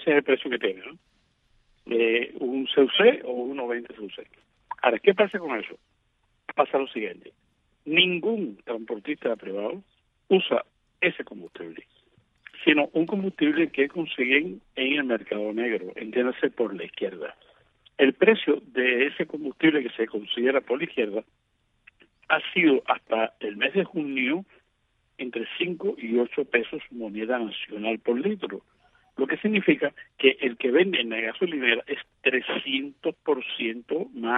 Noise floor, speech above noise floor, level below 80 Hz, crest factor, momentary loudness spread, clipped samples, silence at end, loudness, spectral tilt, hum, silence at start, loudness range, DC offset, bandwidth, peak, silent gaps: -70 dBFS; 45 dB; -72 dBFS; 22 dB; 14 LU; under 0.1%; 0 s; -25 LUFS; -7.5 dB/octave; none; 0 s; 4 LU; under 0.1%; 4 kHz; -4 dBFS; none